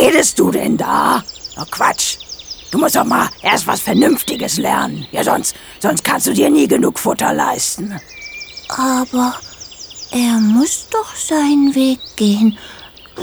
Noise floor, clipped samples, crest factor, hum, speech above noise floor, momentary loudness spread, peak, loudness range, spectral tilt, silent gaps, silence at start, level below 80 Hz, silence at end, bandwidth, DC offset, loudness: -34 dBFS; under 0.1%; 16 dB; none; 19 dB; 16 LU; 0 dBFS; 3 LU; -3.5 dB/octave; none; 0 s; -50 dBFS; 0 s; over 20 kHz; under 0.1%; -15 LUFS